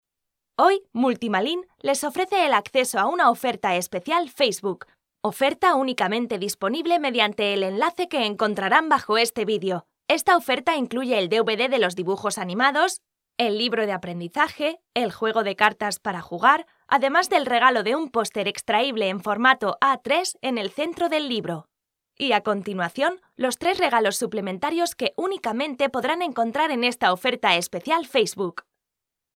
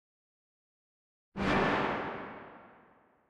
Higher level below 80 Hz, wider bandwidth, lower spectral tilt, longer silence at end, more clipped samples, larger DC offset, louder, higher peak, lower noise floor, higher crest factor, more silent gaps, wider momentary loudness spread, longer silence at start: second, -70 dBFS vs -56 dBFS; first, 17 kHz vs 11 kHz; second, -3 dB/octave vs -6 dB/octave; first, 0.8 s vs 0.55 s; neither; neither; first, -23 LUFS vs -32 LUFS; first, -2 dBFS vs -18 dBFS; first, -85 dBFS vs -64 dBFS; about the same, 22 dB vs 20 dB; neither; second, 8 LU vs 20 LU; second, 0.6 s vs 1.35 s